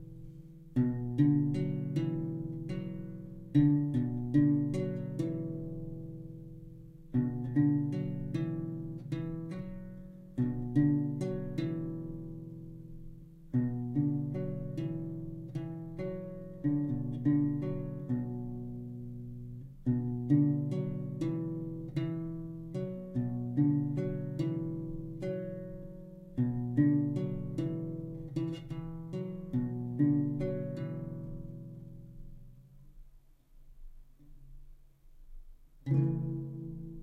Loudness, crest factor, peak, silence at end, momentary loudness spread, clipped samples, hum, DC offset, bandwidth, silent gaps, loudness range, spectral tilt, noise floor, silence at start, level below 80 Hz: -34 LUFS; 18 dB; -16 dBFS; 0 s; 18 LU; under 0.1%; none; under 0.1%; 8 kHz; none; 5 LU; -10 dB/octave; -58 dBFS; 0 s; -52 dBFS